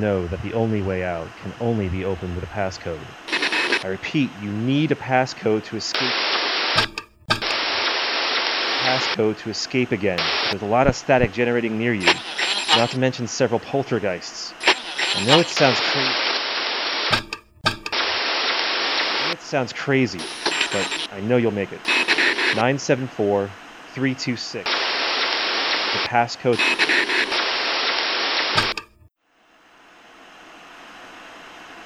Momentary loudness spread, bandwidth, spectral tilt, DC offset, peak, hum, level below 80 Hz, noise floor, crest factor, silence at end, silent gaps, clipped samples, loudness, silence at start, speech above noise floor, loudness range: 10 LU; 16 kHz; -4 dB/octave; under 0.1%; 0 dBFS; none; -50 dBFS; -59 dBFS; 22 dB; 0 s; none; under 0.1%; -21 LUFS; 0 s; 37 dB; 5 LU